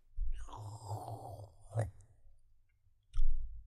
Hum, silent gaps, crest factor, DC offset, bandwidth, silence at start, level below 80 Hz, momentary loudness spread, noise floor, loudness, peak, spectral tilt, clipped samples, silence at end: none; none; 16 dB; under 0.1%; 9.6 kHz; 0.15 s; -38 dBFS; 9 LU; -70 dBFS; -44 LUFS; -18 dBFS; -6.5 dB/octave; under 0.1%; 0.05 s